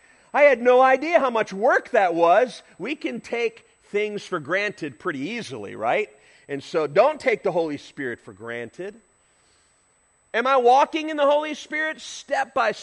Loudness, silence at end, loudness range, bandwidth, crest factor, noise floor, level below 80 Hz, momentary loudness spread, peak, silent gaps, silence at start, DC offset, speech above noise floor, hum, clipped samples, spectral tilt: -22 LUFS; 0 s; 8 LU; 10.5 kHz; 18 dB; -63 dBFS; -72 dBFS; 16 LU; -4 dBFS; none; 0.35 s; under 0.1%; 41 dB; none; under 0.1%; -4.5 dB/octave